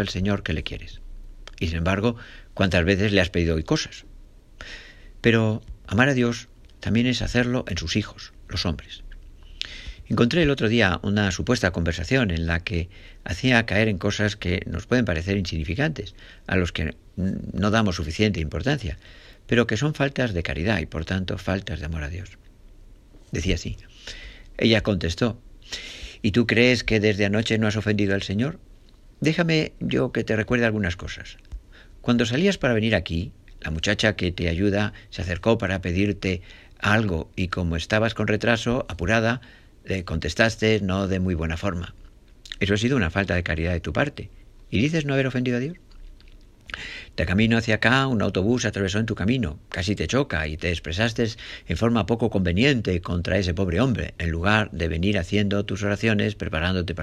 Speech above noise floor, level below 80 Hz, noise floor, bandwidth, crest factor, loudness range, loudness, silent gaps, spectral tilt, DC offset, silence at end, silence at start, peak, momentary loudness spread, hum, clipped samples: 26 dB; -42 dBFS; -49 dBFS; 12.5 kHz; 22 dB; 4 LU; -24 LUFS; none; -5.5 dB/octave; under 0.1%; 0 s; 0 s; -2 dBFS; 14 LU; none; under 0.1%